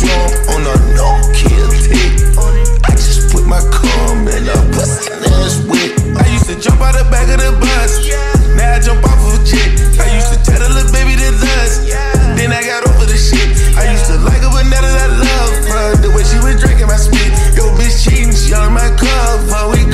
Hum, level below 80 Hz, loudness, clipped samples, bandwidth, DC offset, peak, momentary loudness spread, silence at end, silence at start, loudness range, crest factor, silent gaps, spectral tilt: none; -8 dBFS; -11 LUFS; under 0.1%; 14 kHz; under 0.1%; 0 dBFS; 2 LU; 0 s; 0 s; 1 LU; 8 dB; none; -4.5 dB/octave